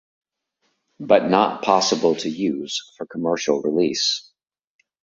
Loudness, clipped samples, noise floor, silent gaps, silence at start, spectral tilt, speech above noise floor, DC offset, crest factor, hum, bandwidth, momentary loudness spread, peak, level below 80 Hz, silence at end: -20 LUFS; under 0.1%; -72 dBFS; none; 1 s; -3.5 dB/octave; 51 dB; under 0.1%; 20 dB; none; 8 kHz; 11 LU; -2 dBFS; -64 dBFS; 0.8 s